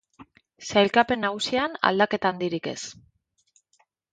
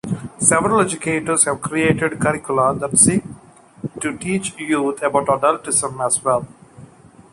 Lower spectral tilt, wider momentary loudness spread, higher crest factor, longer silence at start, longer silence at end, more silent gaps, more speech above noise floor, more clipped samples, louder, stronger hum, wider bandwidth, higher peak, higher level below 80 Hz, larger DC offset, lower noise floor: about the same, -4 dB/octave vs -4 dB/octave; first, 14 LU vs 11 LU; about the same, 24 dB vs 20 dB; first, 0.2 s vs 0.05 s; first, 1.2 s vs 0.5 s; neither; first, 44 dB vs 26 dB; neither; second, -24 LUFS vs -18 LUFS; neither; second, 9.4 kHz vs 12 kHz; about the same, -2 dBFS vs 0 dBFS; second, -62 dBFS vs -50 dBFS; neither; first, -68 dBFS vs -44 dBFS